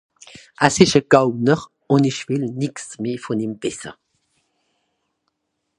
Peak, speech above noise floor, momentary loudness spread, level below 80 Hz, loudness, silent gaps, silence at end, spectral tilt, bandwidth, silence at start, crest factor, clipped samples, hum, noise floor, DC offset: 0 dBFS; 56 dB; 13 LU; -54 dBFS; -19 LUFS; none; 1.85 s; -5 dB/octave; 11.5 kHz; 0.6 s; 20 dB; under 0.1%; none; -74 dBFS; under 0.1%